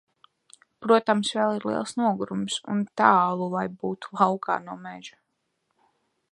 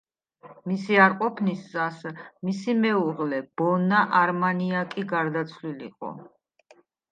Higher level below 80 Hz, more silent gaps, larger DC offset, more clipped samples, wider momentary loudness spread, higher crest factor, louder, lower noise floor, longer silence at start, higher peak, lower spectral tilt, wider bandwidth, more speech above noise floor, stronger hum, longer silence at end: about the same, -72 dBFS vs -76 dBFS; neither; neither; neither; about the same, 17 LU vs 17 LU; about the same, 24 dB vs 20 dB; about the same, -25 LUFS vs -24 LUFS; first, -76 dBFS vs -59 dBFS; first, 0.8 s vs 0.45 s; about the same, -4 dBFS vs -6 dBFS; second, -5 dB/octave vs -7 dB/octave; first, 11 kHz vs 8.8 kHz; first, 51 dB vs 34 dB; neither; first, 1.25 s vs 0.9 s